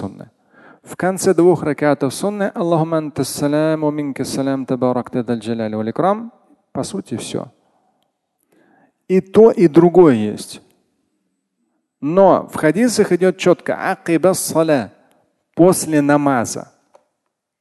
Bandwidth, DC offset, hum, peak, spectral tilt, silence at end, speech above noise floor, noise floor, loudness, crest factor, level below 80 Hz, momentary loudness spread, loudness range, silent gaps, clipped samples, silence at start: 12.5 kHz; under 0.1%; none; 0 dBFS; -6 dB/octave; 1 s; 59 dB; -75 dBFS; -16 LUFS; 16 dB; -56 dBFS; 15 LU; 8 LU; none; under 0.1%; 0 s